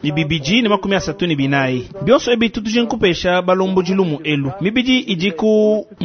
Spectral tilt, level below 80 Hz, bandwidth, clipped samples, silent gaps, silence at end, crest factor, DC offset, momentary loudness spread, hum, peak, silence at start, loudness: -5.5 dB/octave; -44 dBFS; 6.6 kHz; under 0.1%; none; 0 s; 16 dB; under 0.1%; 5 LU; none; 0 dBFS; 0 s; -16 LUFS